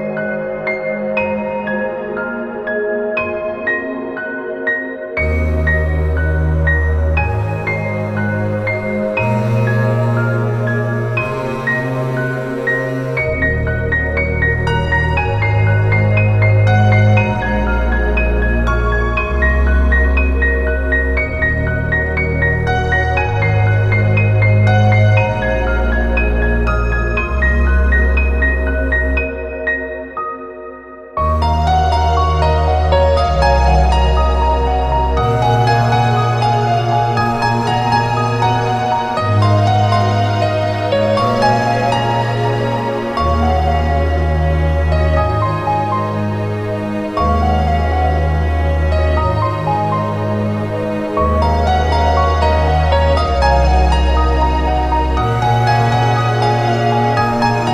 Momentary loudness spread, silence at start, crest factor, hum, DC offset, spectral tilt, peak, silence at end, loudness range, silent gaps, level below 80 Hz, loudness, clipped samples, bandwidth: 6 LU; 0 s; 14 dB; none; under 0.1%; -7 dB/octave; -2 dBFS; 0 s; 4 LU; none; -20 dBFS; -15 LUFS; under 0.1%; 9.8 kHz